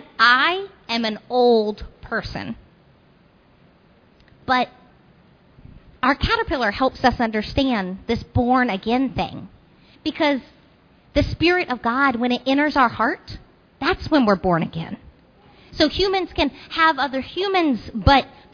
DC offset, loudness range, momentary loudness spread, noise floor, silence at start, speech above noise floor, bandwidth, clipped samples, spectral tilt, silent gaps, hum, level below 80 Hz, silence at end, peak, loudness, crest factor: under 0.1%; 8 LU; 13 LU; -54 dBFS; 0.2 s; 35 dB; 5.4 kHz; under 0.1%; -6 dB/octave; none; none; -40 dBFS; 0.25 s; 0 dBFS; -20 LUFS; 20 dB